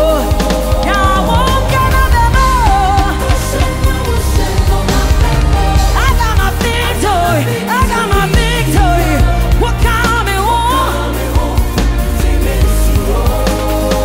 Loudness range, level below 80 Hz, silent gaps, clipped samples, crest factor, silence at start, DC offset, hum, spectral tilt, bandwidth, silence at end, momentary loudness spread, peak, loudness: 2 LU; -14 dBFS; none; under 0.1%; 10 dB; 0 s; under 0.1%; none; -5 dB/octave; 16.5 kHz; 0 s; 4 LU; 0 dBFS; -12 LUFS